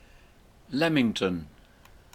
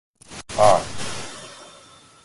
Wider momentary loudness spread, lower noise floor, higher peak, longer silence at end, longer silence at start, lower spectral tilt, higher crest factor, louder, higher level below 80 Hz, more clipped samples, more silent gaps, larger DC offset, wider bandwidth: second, 13 LU vs 23 LU; first, -56 dBFS vs -49 dBFS; second, -10 dBFS vs -2 dBFS; about the same, 0.65 s vs 0.6 s; first, 0.7 s vs 0.3 s; first, -5.5 dB/octave vs -3.5 dB/octave; about the same, 20 dB vs 22 dB; second, -27 LUFS vs -21 LUFS; about the same, -56 dBFS vs -52 dBFS; neither; neither; neither; first, 15.5 kHz vs 11.5 kHz